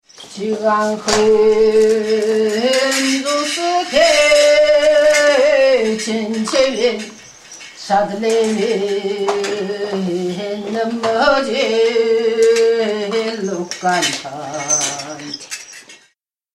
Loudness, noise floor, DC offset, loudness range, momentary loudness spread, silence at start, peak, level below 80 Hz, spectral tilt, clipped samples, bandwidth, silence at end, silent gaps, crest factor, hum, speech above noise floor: -15 LUFS; -60 dBFS; under 0.1%; 6 LU; 15 LU; 0.2 s; 0 dBFS; -50 dBFS; -2.5 dB/octave; under 0.1%; 13.5 kHz; 0.6 s; none; 16 dB; none; 45 dB